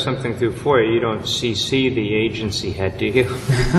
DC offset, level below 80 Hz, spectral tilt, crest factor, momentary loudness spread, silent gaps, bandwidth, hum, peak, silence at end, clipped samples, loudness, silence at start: under 0.1%; -36 dBFS; -5.5 dB/octave; 18 dB; 5 LU; none; 12.5 kHz; none; -2 dBFS; 0 s; under 0.1%; -19 LUFS; 0 s